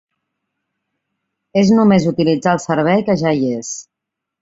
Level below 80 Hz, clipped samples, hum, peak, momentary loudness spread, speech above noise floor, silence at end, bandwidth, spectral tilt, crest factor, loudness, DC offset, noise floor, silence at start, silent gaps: -54 dBFS; under 0.1%; none; -2 dBFS; 11 LU; 67 dB; 0.6 s; 8 kHz; -6 dB/octave; 16 dB; -15 LUFS; under 0.1%; -81 dBFS; 1.55 s; none